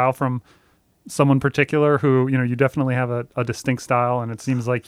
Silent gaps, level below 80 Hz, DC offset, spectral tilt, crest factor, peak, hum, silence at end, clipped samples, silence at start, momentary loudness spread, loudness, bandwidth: none; -56 dBFS; under 0.1%; -7 dB/octave; 18 dB; -2 dBFS; none; 0.05 s; under 0.1%; 0 s; 7 LU; -20 LUFS; 14.5 kHz